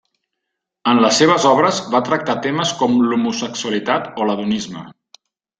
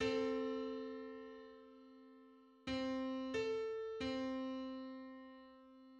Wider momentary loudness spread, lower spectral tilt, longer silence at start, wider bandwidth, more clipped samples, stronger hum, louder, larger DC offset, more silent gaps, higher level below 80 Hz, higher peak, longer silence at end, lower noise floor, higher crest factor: second, 10 LU vs 21 LU; about the same, -4 dB/octave vs -5 dB/octave; first, 0.85 s vs 0 s; about the same, 9.4 kHz vs 8.6 kHz; neither; neither; first, -17 LUFS vs -43 LUFS; neither; neither; first, -60 dBFS vs -70 dBFS; first, -2 dBFS vs -28 dBFS; first, 0.7 s vs 0 s; first, -79 dBFS vs -64 dBFS; about the same, 16 dB vs 18 dB